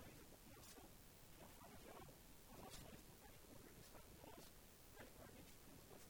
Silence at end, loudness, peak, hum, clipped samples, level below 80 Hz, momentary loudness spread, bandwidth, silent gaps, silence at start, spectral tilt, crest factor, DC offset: 0 s; -62 LUFS; -44 dBFS; none; under 0.1%; -70 dBFS; 4 LU; over 20 kHz; none; 0 s; -3.5 dB/octave; 18 dB; under 0.1%